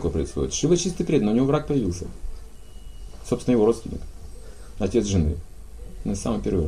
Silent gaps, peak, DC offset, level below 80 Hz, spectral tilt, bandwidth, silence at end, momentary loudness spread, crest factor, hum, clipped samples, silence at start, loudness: none; -8 dBFS; 0.8%; -36 dBFS; -6 dB/octave; 15 kHz; 0 s; 24 LU; 18 dB; none; under 0.1%; 0 s; -24 LUFS